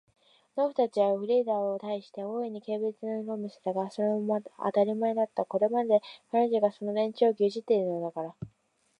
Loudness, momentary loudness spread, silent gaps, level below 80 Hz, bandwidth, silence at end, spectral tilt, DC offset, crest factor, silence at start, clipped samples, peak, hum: -29 LUFS; 10 LU; none; -76 dBFS; 9.6 kHz; 0.5 s; -7.5 dB/octave; under 0.1%; 18 dB; 0.55 s; under 0.1%; -12 dBFS; none